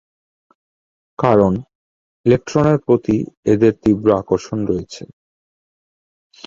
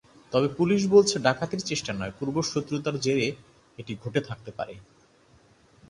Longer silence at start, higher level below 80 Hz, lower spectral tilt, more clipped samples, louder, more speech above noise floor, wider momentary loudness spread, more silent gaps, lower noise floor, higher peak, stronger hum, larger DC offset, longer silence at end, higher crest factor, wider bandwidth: first, 1.2 s vs 0.3 s; first, -46 dBFS vs -60 dBFS; first, -8 dB/octave vs -5 dB/octave; neither; first, -17 LUFS vs -26 LUFS; first, over 74 dB vs 33 dB; second, 10 LU vs 18 LU; first, 1.75-2.24 s, 3.37-3.43 s vs none; first, under -90 dBFS vs -59 dBFS; first, 0 dBFS vs -6 dBFS; neither; neither; first, 1.4 s vs 1.1 s; about the same, 18 dB vs 20 dB; second, 7.6 kHz vs 11 kHz